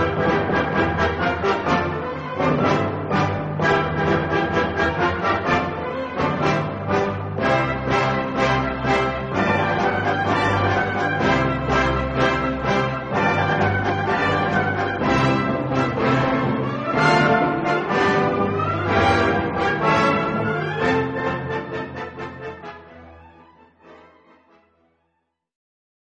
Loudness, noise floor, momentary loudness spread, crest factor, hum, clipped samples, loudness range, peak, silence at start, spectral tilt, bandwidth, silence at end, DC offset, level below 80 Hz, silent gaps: -20 LUFS; -73 dBFS; 6 LU; 18 dB; none; under 0.1%; 5 LU; -4 dBFS; 0 s; -6.5 dB/octave; 9.2 kHz; 2.1 s; under 0.1%; -40 dBFS; none